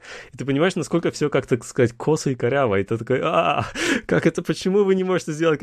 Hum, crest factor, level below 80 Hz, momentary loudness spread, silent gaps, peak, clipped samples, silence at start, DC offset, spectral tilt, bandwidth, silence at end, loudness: none; 16 dB; -52 dBFS; 4 LU; none; -6 dBFS; under 0.1%; 0.05 s; under 0.1%; -5.5 dB/octave; 13.5 kHz; 0 s; -21 LUFS